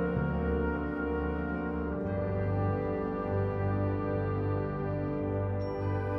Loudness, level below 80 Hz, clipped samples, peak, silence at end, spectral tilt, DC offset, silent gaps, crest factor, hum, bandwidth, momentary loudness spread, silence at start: -32 LUFS; -42 dBFS; under 0.1%; -18 dBFS; 0 s; -11 dB/octave; under 0.1%; none; 12 dB; none; 5.8 kHz; 3 LU; 0 s